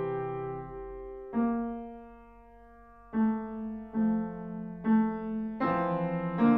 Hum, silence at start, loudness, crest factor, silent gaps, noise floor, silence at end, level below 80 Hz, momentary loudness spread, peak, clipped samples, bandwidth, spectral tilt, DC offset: none; 0 s; -32 LUFS; 18 dB; none; -54 dBFS; 0 s; -56 dBFS; 15 LU; -14 dBFS; under 0.1%; 4.3 kHz; -11 dB/octave; under 0.1%